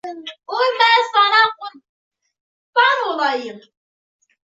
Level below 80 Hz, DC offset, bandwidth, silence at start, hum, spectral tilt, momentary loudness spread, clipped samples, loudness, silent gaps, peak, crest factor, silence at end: -78 dBFS; under 0.1%; 7.8 kHz; 0.05 s; none; -1 dB/octave; 20 LU; under 0.1%; -16 LUFS; 1.89-2.11 s, 2.41-2.73 s; -2 dBFS; 18 dB; 0.95 s